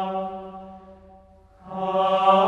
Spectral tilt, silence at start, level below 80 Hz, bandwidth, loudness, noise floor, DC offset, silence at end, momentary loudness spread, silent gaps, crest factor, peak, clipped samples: -6.5 dB/octave; 0 s; -58 dBFS; 7.8 kHz; -23 LUFS; -52 dBFS; under 0.1%; 0 s; 24 LU; none; 18 dB; -6 dBFS; under 0.1%